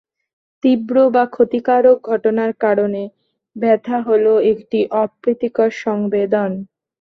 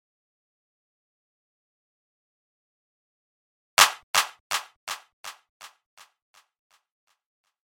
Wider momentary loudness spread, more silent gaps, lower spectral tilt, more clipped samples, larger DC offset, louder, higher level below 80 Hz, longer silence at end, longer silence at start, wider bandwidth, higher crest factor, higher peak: second, 7 LU vs 24 LU; second, none vs 4.03-4.14 s, 4.40-4.50 s, 4.76-4.87 s, 5.13-5.24 s, 5.49-5.60 s; first, -8 dB/octave vs 2.5 dB/octave; neither; neither; first, -16 LUFS vs -23 LUFS; first, -62 dBFS vs -80 dBFS; second, 0.35 s vs 2.1 s; second, 0.65 s vs 3.8 s; second, 6.4 kHz vs 16.5 kHz; second, 14 dB vs 30 dB; about the same, -2 dBFS vs -2 dBFS